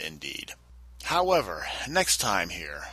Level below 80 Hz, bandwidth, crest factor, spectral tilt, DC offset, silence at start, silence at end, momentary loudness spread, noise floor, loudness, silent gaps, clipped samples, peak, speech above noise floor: -50 dBFS; 15.5 kHz; 20 dB; -2 dB/octave; under 0.1%; 0 s; 0 s; 15 LU; -49 dBFS; -27 LUFS; none; under 0.1%; -8 dBFS; 22 dB